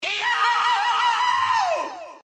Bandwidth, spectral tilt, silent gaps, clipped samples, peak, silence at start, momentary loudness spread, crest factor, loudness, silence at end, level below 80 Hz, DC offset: 9.6 kHz; 0 dB/octave; none; under 0.1%; -10 dBFS; 0 s; 6 LU; 12 dB; -20 LUFS; 0.05 s; -76 dBFS; under 0.1%